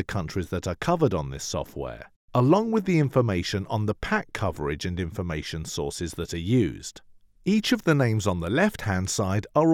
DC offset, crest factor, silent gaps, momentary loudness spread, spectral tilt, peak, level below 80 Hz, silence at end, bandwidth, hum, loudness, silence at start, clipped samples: under 0.1%; 20 dB; 2.16-2.28 s; 10 LU; -5.5 dB/octave; -6 dBFS; -48 dBFS; 0 s; 17 kHz; none; -26 LUFS; 0 s; under 0.1%